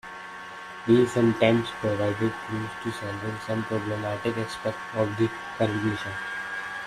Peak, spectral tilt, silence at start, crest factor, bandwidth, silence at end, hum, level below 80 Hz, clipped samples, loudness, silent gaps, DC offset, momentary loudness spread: -6 dBFS; -6.5 dB/octave; 0.05 s; 22 dB; 13.5 kHz; 0 s; none; -58 dBFS; under 0.1%; -27 LUFS; none; under 0.1%; 11 LU